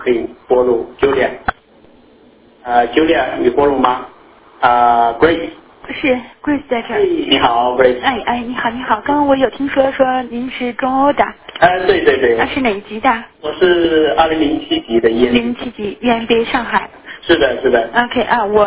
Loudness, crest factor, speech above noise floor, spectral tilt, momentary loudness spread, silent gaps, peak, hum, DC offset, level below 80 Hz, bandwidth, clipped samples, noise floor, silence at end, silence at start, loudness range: -14 LUFS; 14 dB; 32 dB; -8.5 dB/octave; 8 LU; none; 0 dBFS; none; under 0.1%; -42 dBFS; 4 kHz; under 0.1%; -46 dBFS; 0 s; 0 s; 2 LU